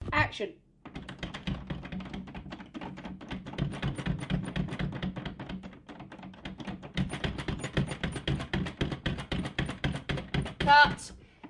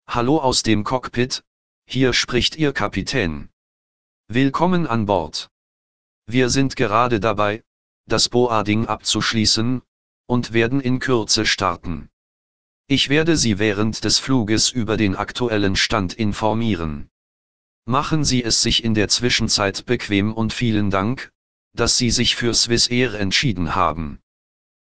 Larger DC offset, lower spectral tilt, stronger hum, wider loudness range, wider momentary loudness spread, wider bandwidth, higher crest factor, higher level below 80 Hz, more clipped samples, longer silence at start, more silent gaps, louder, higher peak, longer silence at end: second, under 0.1% vs 2%; first, -5.5 dB/octave vs -4 dB/octave; neither; first, 10 LU vs 3 LU; first, 16 LU vs 9 LU; about the same, 11.5 kHz vs 10.5 kHz; first, 26 dB vs 18 dB; second, -46 dBFS vs -40 dBFS; neither; about the same, 0 s vs 0 s; second, none vs 1.47-1.82 s, 3.53-4.24 s, 5.51-6.22 s, 7.67-8.04 s, 9.88-10.24 s, 12.13-12.84 s, 17.11-17.82 s, 21.35-21.71 s; second, -32 LUFS vs -19 LUFS; second, -8 dBFS vs -2 dBFS; second, 0 s vs 0.65 s